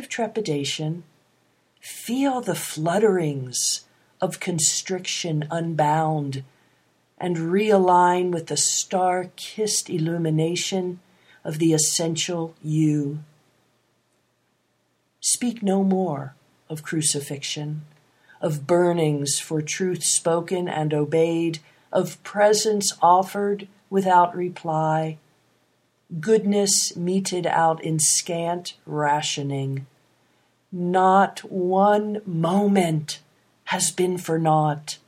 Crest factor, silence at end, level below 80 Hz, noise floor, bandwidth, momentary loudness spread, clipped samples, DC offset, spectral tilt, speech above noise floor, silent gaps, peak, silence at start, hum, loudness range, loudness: 20 dB; 0.1 s; -72 dBFS; -69 dBFS; 16 kHz; 13 LU; under 0.1%; under 0.1%; -4 dB/octave; 46 dB; none; -4 dBFS; 0 s; none; 4 LU; -22 LUFS